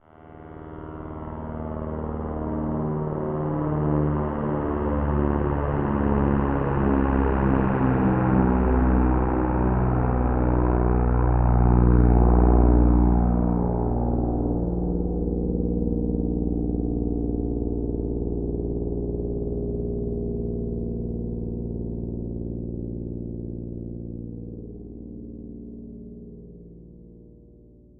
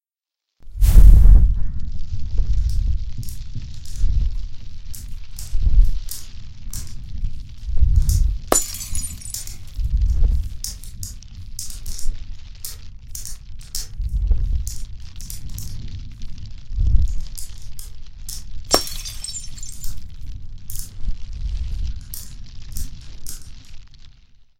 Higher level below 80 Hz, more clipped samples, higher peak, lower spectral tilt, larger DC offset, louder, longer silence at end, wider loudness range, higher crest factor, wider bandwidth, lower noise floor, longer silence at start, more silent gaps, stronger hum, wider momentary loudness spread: second, -28 dBFS vs -20 dBFS; neither; second, -4 dBFS vs 0 dBFS; first, -10.5 dB/octave vs -4 dB/octave; neither; about the same, -24 LUFS vs -24 LUFS; first, 0.7 s vs 0.55 s; first, 15 LU vs 12 LU; about the same, 18 dB vs 18 dB; second, 3.1 kHz vs 17 kHz; second, -50 dBFS vs -85 dBFS; second, 0.2 s vs 0.65 s; neither; neither; about the same, 18 LU vs 19 LU